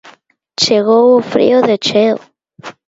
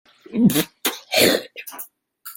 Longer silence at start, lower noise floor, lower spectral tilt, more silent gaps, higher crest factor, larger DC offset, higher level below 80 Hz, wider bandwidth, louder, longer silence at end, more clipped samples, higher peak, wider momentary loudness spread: second, 0.05 s vs 0.3 s; about the same, -45 dBFS vs -43 dBFS; about the same, -4 dB/octave vs -3.5 dB/octave; neither; second, 12 dB vs 20 dB; neither; about the same, -58 dBFS vs -58 dBFS; second, 7.8 kHz vs 17 kHz; first, -11 LUFS vs -19 LUFS; about the same, 0.15 s vs 0.05 s; neither; about the same, 0 dBFS vs -2 dBFS; second, 7 LU vs 20 LU